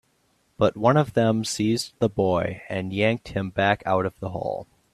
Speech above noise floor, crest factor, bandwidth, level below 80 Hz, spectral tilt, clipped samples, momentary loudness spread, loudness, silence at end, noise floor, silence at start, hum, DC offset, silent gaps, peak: 43 dB; 20 dB; 14 kHz; -54 dBFS; -5.5 dB/octave; under 0.1%; 10 LU; -24 LUFS; 0.3 s; -66 dBFS; 0.6 s; none; under 0.1%; none; -4 dBFS